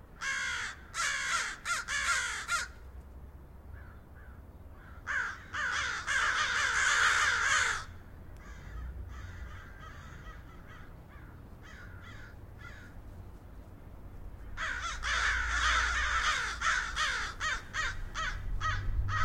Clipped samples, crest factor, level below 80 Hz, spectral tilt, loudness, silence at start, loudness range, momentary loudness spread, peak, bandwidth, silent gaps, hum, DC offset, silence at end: under 0.1%; 20 dB; -44 dBFS; -1 dB/octave; -31 LUFS; 0 s; 21 LU; 24 LU; -16 dBFS; 16.5 kHz; none; none; under 0.1%; 0 s